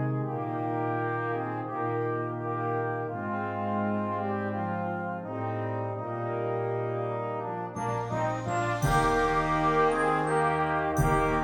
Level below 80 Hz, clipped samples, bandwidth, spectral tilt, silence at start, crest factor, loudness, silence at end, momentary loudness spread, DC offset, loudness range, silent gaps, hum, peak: -46 dBFS; under 0.1%; 17.5 kHz; -6.5 dB/octave; 0 s; 16 dB; -29 LUFS; 0 s; 8 LU; under 0.1%; 6 LU; none; none; -12 dBFS